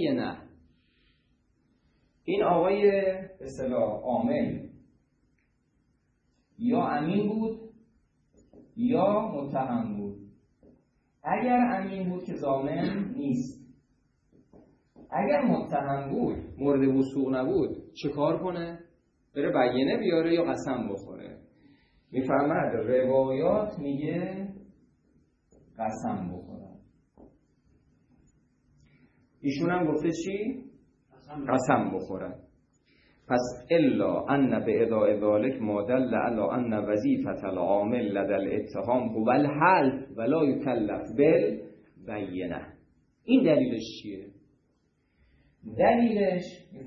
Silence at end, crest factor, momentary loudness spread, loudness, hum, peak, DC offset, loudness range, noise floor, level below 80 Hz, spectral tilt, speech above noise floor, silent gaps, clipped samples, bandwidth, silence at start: 0 s; 22 dB; 15 LU; -27 LUFS; none; -8 dBFS; under 0.1%; 7 LU; -71 dBFS; -60 dBFS; -7.5 dB/octave; 44 dB; none; under 0.1%; 8 kHz; 0 s